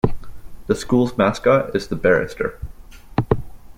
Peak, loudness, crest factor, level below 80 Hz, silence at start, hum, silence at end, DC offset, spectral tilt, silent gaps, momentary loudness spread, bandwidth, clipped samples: -2 dBFS; -20 LUFS; 18 dB; -36 dBFS; 0.05 s; none; 0.05 s; under 0.1%; -6.5 dB/octave; none; 10 LU; 16 kHz; under 0.1%